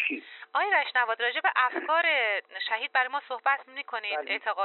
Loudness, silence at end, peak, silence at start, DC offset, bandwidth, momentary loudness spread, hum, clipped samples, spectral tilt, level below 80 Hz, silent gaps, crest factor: -27 LUFS; 0 s; -12 dBFS; 0 s; under 0.1%; 4.3 kHz; 8 LU; none; under 0.1%; 5.5 dB/octave; under -90 dBFS; none; 18 dB